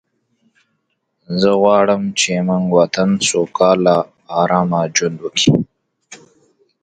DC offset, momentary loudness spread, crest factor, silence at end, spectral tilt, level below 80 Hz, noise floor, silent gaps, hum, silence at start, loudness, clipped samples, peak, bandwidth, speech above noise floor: under 0.1%; 7 LU; 16 dB; 0.65 s; -4.5 dB/octave; -54 dBFS; -69 dBFS; none; none; 1.3 s; -15 LUFS; under 0.1%; 0 dBFS; 9.4 kHz; 55 dB